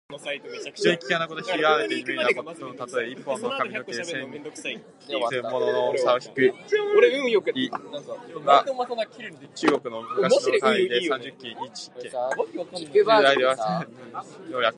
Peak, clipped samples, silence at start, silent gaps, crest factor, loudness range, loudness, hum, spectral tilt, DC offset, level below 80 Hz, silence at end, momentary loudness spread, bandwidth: -4 dBFS; under 0.1%; 0.1 s; none; 22 dB; 5 LU; -24 LUFS; none; -4 dB/octave; under 0.1%; -78 dBFS; 0 s; 17 LU; 11.5 kHz